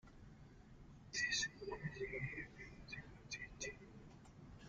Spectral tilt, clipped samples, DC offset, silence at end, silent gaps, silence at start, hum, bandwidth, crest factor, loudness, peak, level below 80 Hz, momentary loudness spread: -2.5 dB/octave; under 0.1%; under 0.1%; 0 s; none; 0.05 s; none; 11 kHz; 20 dB; -45 LUFS; -28 dBFS; -64 dBFS; 23 LU